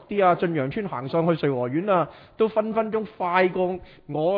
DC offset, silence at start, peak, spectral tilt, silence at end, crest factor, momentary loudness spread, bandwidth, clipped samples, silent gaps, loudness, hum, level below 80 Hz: under 0.1%; 0 s; -6 dBFS; -10 dB/octave; 0 s; 18 dB; 7 LU; 5.2 kHz; under 0.1%; none; -24 LUFS; none; -60 dBFS